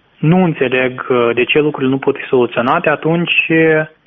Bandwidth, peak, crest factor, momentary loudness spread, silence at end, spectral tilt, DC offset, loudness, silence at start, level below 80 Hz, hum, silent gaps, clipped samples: 3.9 kHz; 0 dBFS; 14 dB; 4 LU; 0.2 s; -4.5 dB/octave; under 0.1%; -13 LUFS; 0.2 s; -52 dBFS; none; none; under 0.1%